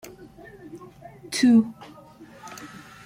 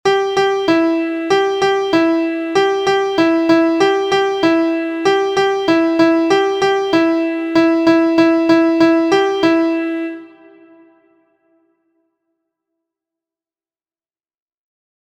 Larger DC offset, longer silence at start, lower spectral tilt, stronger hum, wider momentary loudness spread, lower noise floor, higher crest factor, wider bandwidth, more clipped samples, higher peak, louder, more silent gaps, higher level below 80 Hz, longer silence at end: neither; first, 0.75 s vs 0.05 s; about the same, -4.5 dB/octave vs -4.5 dB/octave; neither; first, 27 LU vs 5 LU; second, -47 dBFS vs under -90 dBFS; about the same, 18 dB vs 14 dB; first, 16 kHz vs 8.8 kHz; neither; second, -8 dBFS vs 0 dBFS; second, -21 LUFS vs -14 LUFS; neither; second, -64 dBFS vs -56 dBFS; second, 0.4 s vs 4.8 s